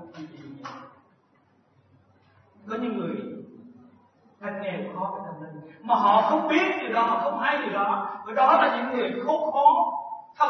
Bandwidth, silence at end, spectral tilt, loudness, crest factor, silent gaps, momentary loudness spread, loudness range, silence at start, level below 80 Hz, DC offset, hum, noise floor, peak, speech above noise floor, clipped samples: 6.4 kHz; 0 s; -6 dB/octave; -24 LUFS; 20 dB; none; 21 LU; 14 LU; 0 s; -84 dBFS; under 0.1%; none; -63 dBFS; -6 dBFS; 39 dB; under 0.1%